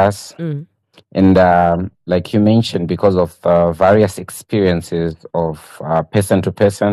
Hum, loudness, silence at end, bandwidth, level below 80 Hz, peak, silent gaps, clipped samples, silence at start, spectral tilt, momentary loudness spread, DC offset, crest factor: none; -15 LUFS; 0 s; 13 kHz; -44 dBFS; -2 dBFS; none; under 0.1%; 0 s; -7 dB/octave; 13 LU; under 0.1%; 12 dB